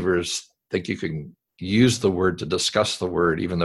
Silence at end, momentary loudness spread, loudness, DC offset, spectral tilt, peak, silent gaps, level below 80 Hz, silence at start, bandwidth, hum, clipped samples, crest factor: 0 s; 11 LU; -23 LUFS; under 0.1%; -4.5 dB/octave; -4 dBFS; none; -46 dBFS; 0 s; 12.5 kHz; none; under 0.1%; 18 dB